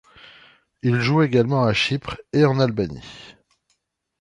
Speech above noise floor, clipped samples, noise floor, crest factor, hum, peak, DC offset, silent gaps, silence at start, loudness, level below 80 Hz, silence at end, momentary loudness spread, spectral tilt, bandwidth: 51 dB; under 0.1%; -71 dBFS; 18 dB; none; -4 dBFS; under 0.1%; none; 0.85 s; -20 LUFS; -50 dBFS; 0.9 s; 15 LU; -6.5 dB/octave; 10.5 kHz